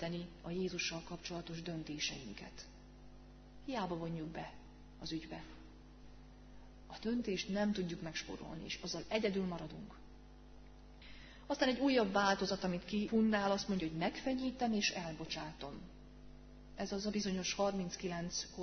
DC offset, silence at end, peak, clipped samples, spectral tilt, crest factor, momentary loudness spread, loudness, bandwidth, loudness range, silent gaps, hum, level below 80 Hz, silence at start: under 0.1%; 0 s; -20 dBFS; under 0.1%; -4 dB/octave; 22 dB; 25 LU; -39 LUFS; 6.4 kHz; 11 LU; none; none; -60 dBFS; 0 s